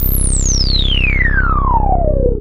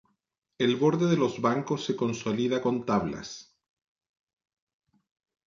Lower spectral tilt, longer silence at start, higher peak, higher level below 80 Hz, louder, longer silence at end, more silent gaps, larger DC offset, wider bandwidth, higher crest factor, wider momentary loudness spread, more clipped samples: second, -3.5 dB/octave vs -6 dB/octave; second, 0 s vs 0.6 s; first, 0 dBFS vs -12 dBFS; first, -14 dBFS vs -64 dBFS; first, -14 LUFS vs -27 LUFS; second, 0 s vs 2.05 s; neither; neither; first, 16 kHz vs 7.6 kHz; second, 12 dB vs 18 dB; second, 2 LU vs 11 LU; neither